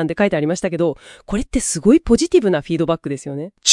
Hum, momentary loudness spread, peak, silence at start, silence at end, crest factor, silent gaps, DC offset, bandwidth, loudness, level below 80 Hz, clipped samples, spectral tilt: none; 12 LU; 0 dBFS; 0 s; 0 s; 18 dB; none; under 0.1%; 12 kHz; -18 LUFS; -36 dBFS; under 0.1%; -4 dB/octave